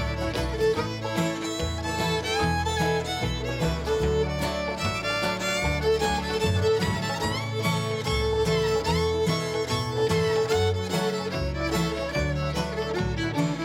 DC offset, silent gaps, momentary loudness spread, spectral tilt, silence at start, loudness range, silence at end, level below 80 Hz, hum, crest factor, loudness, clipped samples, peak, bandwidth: under 0.1%; none; 4 LU; -5 dB/octave; 0 s; 2 LU; 0 s; -38 dBFS; none; 14 dB; -26 LUFS; under 0.1%; -12 dBFS; 16.5 kHz